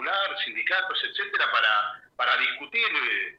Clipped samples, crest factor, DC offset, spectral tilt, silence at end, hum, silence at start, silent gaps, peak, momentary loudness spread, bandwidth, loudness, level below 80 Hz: under 0.1%; 18 dB; under 0.1%; -1.5 dB/octave; 0.05 s; none; 0 s; none; -8 dBFS; 6 LU; 8.2 kHz; -24 LUFS; -76 dBFS